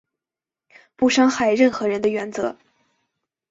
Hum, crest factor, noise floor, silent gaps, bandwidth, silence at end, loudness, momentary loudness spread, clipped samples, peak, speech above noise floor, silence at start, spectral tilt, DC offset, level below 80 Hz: none; 18 dB; -89 dBFS; none; 7.8 kHz; 0.95 s; -20 LUFS; 10 LU; under 0.1%; -4 dBFS; 70 dB; 1 s; -4 dB/octave; under 0.1%; -60 dBFS